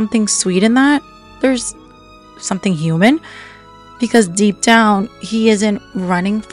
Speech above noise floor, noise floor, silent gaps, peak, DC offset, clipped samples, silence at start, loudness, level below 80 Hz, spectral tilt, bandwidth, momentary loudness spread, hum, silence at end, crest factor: 27 dB; -41 dBFS; none; 0 dBFS; under 0.1%; under 0.1%; 0 s; -14 LUFS; -50 dBFS; -4.5 dB/octave; 12 kHz; 11 LU; none; 0.1 s; 16 dB